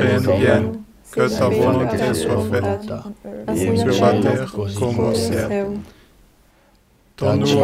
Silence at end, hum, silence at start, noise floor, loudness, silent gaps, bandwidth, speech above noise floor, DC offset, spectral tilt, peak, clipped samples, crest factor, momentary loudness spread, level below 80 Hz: 0 s; none; 0 s; -55 dBFS; -19 LUFS; none; 16 kHz; 37 dB; under 0.1%; -6 dB/octave; -2 dBFS; under 0.1%; 16 dB; 13 LU; -46 dBFS